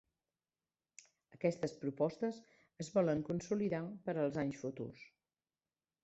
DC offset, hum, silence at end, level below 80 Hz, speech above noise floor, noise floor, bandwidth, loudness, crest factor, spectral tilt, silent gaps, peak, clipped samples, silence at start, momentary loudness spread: under 0.1%; none; 1 s; -74 dBFS; over 52 dB; under -90 dBFS; 8 kHz; -39 LUFS; 20 dB; -7 dB/octave; none; -20 dBFS; under 0.1%; 1.4 s; 13 LU